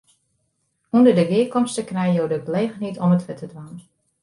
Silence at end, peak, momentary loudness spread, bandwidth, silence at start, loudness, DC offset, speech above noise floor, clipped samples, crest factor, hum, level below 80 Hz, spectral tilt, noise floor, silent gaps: 0.45 s; -4 dBFS; 19 LU; 11.5 kHz; 0.95 s; -20 LUFS; under 0.1%; 51 dB; under 0.1%; 18 dB; none; -64 dBFS; -7 dB/octave; -71 dBFS; none